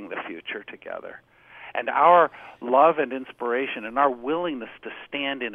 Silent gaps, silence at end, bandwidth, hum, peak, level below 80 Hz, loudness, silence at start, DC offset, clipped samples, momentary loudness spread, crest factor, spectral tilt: none; 0 s; 3.8 kHz; none; -4 dBFS; -68 dBFS; -23 LUFS; 0 s; under 0.1%; under 0.1%; 19 LU; 20 dB; -7 dB/octave